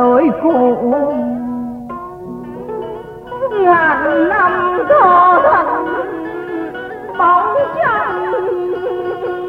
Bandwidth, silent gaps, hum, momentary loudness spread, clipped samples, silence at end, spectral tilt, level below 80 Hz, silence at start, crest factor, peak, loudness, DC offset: 5.4 kHz; none; none; 17 LU; under 0.1%; 0 s; -7.5 dB/octave; -48 dBFS; 0 s; 14 dB; 0 dBFS; -14 LUFS; under 0.1%